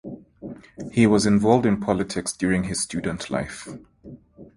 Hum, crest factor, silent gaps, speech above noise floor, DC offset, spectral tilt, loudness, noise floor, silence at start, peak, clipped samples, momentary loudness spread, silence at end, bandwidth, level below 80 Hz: none; 20 dB; none; 23 dB; under 0.1%; -5.5 dB/octave; -22 LUFS; -45 dBFS; 0.05 s; -2 dBFS; under 0.1%; 22 LU; 0.15 s; 11.5 kHz; -48 dBFS